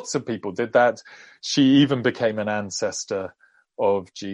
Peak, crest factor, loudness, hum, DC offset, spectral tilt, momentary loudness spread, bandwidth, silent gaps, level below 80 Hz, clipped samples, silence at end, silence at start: -6 dBFS; 16 dB; -22 LUFS; none; under 0.1%; -4.5 dB/octave; 13 LU; 10 kHz; none; -66 dBFS; under 0.1%; 0 s; 0 s